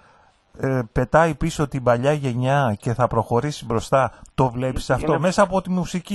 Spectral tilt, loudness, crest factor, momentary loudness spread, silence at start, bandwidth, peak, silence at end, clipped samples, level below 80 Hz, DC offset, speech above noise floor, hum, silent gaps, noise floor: -6.5 dB/octave; -21 LUFS; 18 dB; 7 LU; 0.55 s; 12.5 kHz; -4 dBFS; 0 s; under 0.1%; -40 dBFS; under 0.1%; 35 dB; none; none; -55 dBFS